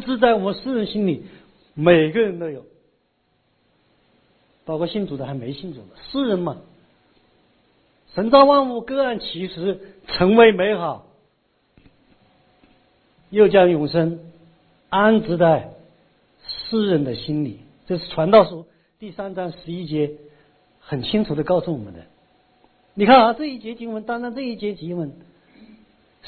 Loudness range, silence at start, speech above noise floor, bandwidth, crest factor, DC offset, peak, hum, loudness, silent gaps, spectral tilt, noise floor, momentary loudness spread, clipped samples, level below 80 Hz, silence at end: 9 LU; 0 s; 48 dB; 4.6 kHz; 20 dB; under 0.1%; 0 dBFS; none; -19 LUFS; none; -10 dB/octave; -66 dBFS; 19 LU; under 0.1%; -54 dBFS; 0 s